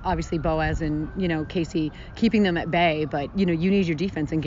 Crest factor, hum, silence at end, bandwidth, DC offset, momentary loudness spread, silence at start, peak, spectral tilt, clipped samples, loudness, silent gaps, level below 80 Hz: 14 dB; none; 0 s; 7.4 kHz; under 0.1%; 6 LU; 0 s; -10 dBFS; -5.5 dB/octave; under 0.1%; -24 LUFS; none; -38 dBFS